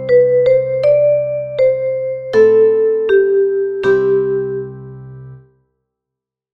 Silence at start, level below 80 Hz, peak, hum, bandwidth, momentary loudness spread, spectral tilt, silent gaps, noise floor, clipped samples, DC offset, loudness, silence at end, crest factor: 0 s; -52 dBFS; -2 dBFS; none; 6 kHz; 14 LU; -8 dB/octave; none; -83 dBFS; under 0.1%; under 0.1%; -14 LUFS; 1.15 s; 12 dB